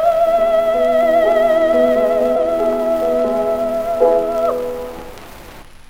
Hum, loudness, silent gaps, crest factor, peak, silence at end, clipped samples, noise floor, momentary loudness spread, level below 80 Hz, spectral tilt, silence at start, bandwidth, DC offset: none; -15 LUFS; none; 12 dB; -2 dBFS; 0.05 s; under 0.1%; -36 dBFS; 11 LU; -42 dBFS; -5.5 dB/octave; 0 s; 16.5 kHz; under 0.1%